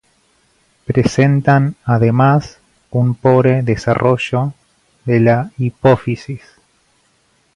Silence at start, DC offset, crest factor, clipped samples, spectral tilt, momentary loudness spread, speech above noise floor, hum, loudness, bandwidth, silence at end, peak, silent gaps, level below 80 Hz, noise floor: 0.9 s; under 0.1%; 16 dB; under 0.1%; -8 dB/octave; 12 LU; 45 dB; none; -15 LUFS; 10.5 kHz; 1.2 s; 0 dBFS; none; -46 dBFS; -58 dBFS